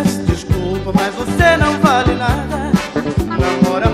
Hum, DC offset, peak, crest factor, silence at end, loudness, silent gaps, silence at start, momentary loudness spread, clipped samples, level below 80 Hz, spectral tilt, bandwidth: none; under 0.1%; 0 dBFS; 14 dB; 0 s; -15 LUFS; none; 0 s; 6 LU; under 0.1%; -26 dBFS; -6 dB/octave; 15 kHz